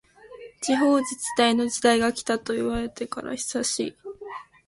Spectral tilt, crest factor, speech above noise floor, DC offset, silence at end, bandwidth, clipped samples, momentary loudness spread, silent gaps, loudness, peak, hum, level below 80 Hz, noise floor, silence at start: -2.5 dB/octave; 20 dB; 21 dB; under 0.1%; 0.25 s; 11.5 kHz; under 0.1%; 18 LU; none; -24 LUFS; -4 dBFS; none; -52 dBFS; -45 dBFS; 0.25 s